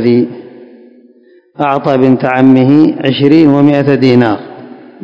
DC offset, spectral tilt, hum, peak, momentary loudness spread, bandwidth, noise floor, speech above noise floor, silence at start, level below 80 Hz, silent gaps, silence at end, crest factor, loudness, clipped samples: under 0.1%; -9 dB/octave; none; 0 dBFS; 12 LU; 6.6 kHz; -44 dBFS; 36 dB; 0 s; -52 dBFS; none; 0.3 s; 10 dB; -9 LUFS; 2%